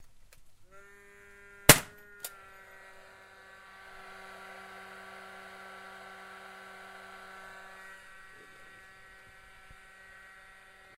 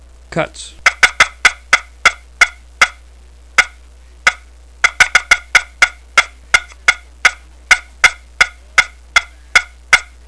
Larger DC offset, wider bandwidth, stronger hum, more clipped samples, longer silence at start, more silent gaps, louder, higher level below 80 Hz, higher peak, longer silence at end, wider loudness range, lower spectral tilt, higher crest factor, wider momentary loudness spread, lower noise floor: second, under 0.1% vs 0.3%; first, 16 kHz vs 11 kHz; neither; second, under 0.1% vs 0.7%; second, 0 s vs 0.3 s; neither; second, -24 LUFS vs -13 LUFS; second, -56 dBFS vs -38 dBFS; about the same, 0 dBFS vs 0 dBFS; first, 0.4 s vs 0.25 s; first, 21 LU vs 2 LU; first, -2 dB/octave vs 0 dB/octave; first, 36 dB vs 16 dB; first, 14 LU vs 5 LU; first, -56 dBFS vs -40 dBFS